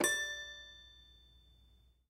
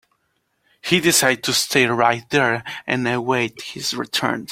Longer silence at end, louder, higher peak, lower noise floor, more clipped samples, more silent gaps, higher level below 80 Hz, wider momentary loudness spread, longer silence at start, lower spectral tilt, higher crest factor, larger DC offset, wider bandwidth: first, 0.7 s vs 0 s; second, -38 LUFS vs -19 LUFS; second, -18 dBFS vs -2 dBFS; about the same, -67 dBFS vs -69 dBFS; neither; neither; second, -66 dBFS vs -58 dBFS; first, 25 LU vs 10 LU; second, 0 s vs 0.85 s; second, -0.5 dB/octave vs -3 dB/octave; about the same, 24 dB vs 20 dB; neither; about the same, 16 kHz vs 16.5 kHz